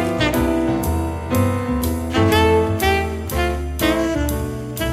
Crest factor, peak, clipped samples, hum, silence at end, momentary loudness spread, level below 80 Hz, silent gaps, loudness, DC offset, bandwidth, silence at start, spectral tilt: 14 dB; -4 dBFS; under 0.1%; none; 0 s; 8 LU; -28 dBFS; none; -19 LUFS; under 0.1%; 16 kHz; 0 s; -5.5 dB/octave